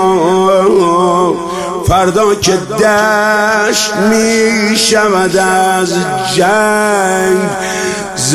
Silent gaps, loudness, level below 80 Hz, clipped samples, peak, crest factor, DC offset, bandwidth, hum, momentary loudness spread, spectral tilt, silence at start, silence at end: none; -10 LUFS; -36 dBFS; under 0.1%; 0 dBFS; 10 dB; under 0.1%; 16 kHz; none; 6 LU; -3.5 dB/octave; 0 s; 0 s